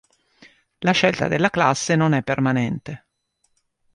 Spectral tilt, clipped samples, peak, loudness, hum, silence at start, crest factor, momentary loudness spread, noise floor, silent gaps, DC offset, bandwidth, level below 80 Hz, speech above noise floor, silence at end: -5 dB/octave; under 0.1%; -2 dBFS; -20 LUFS; none; 0.8 s; 20 dB; 11 LU; -69 dBFS; none; under 0.1%; 11 kHz; -56 dBFS; 50 dB; 1 s